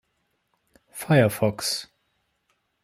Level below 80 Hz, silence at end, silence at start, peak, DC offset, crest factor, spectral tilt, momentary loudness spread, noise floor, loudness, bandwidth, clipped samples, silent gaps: -64 dBFS; 1 s; 0.95 s; -6 dBFS; under 0.1%; 22 dB; -5 dB/octave; 18 LU; -73 dBFS; -23 LUFS; 16 kHz; under 0.1%; none